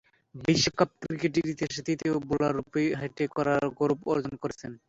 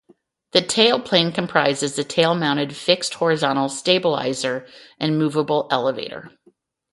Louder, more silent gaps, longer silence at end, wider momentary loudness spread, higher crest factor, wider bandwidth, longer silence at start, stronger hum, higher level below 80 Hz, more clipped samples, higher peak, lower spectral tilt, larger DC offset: second, -28 LUFS vs -20 LUFS; neither; second, 0.1 s vs 0.65 s; about the same, 7 LU vs 8 LU; about the same, 20 dB vs 20 dB; second, 8 kHz vs 11.5 kHz; second, 0.35 s vs 0.55 s; neither; first, -58 dBFS vs -64 dBFS; neither; second, -8 dBFS vs 0 dBFS; about the same, -5 dB/octave vs -4 dB/octave; neither